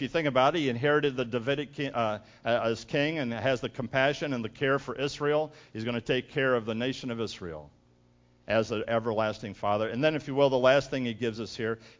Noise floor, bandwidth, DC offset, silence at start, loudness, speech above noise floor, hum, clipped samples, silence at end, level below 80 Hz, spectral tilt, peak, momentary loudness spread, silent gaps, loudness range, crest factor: -63 dBFS; 7.6 kHz; under 0.1%; 0 s; -29 LUFS; 34 dB; none; under 0.1%; 0.1 s; -60 dBFS; -6 dB/octave; -8 dBFS; 9 LU; none; 4 LU; 20 dB